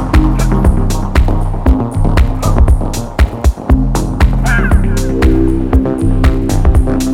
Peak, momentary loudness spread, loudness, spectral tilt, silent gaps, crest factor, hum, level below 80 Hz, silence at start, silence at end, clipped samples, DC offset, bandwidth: 0 dBFS; 4 LU; -13 LUFS; -7 dB/octave; none; 10 dB; none; -12 dBFS; 0 s; 0 s; under 0.1%; under 0.1%; 15.5 kHz